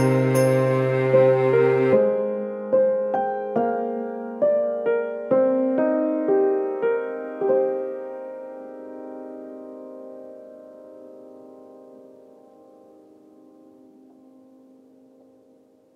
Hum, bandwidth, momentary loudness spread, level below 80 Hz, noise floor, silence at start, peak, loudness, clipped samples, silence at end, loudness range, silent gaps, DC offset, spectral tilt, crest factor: none; 13.5 kHz; 22 LU; -72 dBFS; -56 dBFS; 0 s; -6 dBFS; -22 LUFS; under 0.1%; 4 s; 21 LU; none; under 0.1%; -8 dB/octave; 18 dB